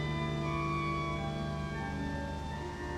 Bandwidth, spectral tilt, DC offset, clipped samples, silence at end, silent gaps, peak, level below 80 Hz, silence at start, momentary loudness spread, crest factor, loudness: 11 kHz; -6.5 dB/octave; under 0.1%; under 0.1%; 0 s; none; -22 dBFS; -46 dBFS; 0 s; 6 LU; 12 dB; -36 LUFS